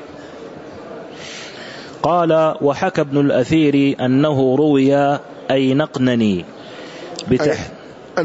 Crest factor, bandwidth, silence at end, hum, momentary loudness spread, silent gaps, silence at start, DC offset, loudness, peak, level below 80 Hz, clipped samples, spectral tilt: 14 dB; 8 kHz; 0 s; none; 20 LU; none; 0 s; under 0.1%; -16 LUFS; -4 dBFS; -52 dBFS; under 0.1%; -7 dB/octave